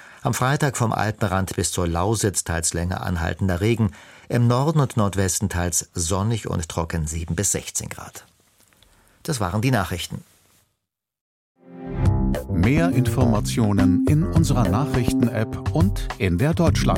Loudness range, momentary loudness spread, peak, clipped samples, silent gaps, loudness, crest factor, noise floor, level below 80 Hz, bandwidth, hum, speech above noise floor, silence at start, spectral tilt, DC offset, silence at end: 8 LU; 8 LU; -4 dBFS; under 0.1%; 11.21-11.55 s; -22 LUFS; 18 dB; -79 dBFS; -34 dBFS; 16.5 kHz; none; 58 dB; 0 s; -5.5 dB/octave; under 0.1%; 0 s